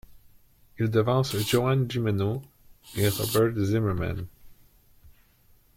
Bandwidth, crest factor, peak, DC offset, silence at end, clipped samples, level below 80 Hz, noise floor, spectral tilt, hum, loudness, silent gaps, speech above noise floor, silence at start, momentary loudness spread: 16.5 kHz; 18 dB; -10 dBFS; under 0.1%; 0.7 s; under 0.1%; -52 dBFS; -60 dBFS; -6 dB/octave; none; -26 LUFS; none; 35 dB; 0.1 s; 11 LU